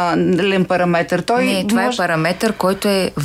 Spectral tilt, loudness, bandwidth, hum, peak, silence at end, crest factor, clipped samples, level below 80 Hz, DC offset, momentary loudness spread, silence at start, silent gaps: -5.5 dB/octave; -16 LUFS; 16 kHz; none; -2 dBFS; 0 s; 14 dB; under 0.1%; -50 dBFS; under 0.1%; 2 LU; 0 s; none